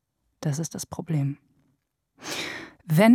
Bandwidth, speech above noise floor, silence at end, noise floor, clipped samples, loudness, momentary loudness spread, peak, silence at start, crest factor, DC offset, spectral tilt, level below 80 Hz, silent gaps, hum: 18 kHz; 51 dB; 0 s; -73 dBFS; under 0.1%; -29 LUFS; 12 LU; -6 dBFS; 0.4 s; 18 dB; under 0.1%; -6 dB/octave; -66 dBFS; none; none